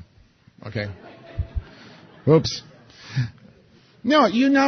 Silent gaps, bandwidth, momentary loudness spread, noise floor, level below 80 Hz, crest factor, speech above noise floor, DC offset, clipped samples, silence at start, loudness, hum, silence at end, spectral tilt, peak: none; 6.6 kHz; 23 LU; -55 dBFS; -40 dBFS; 20 dB; 36 dB; under 0.1%; under 0.1%; 0.65 s; -23 LUFS; none; 0 s; -6 dB/octave; -4 dBFS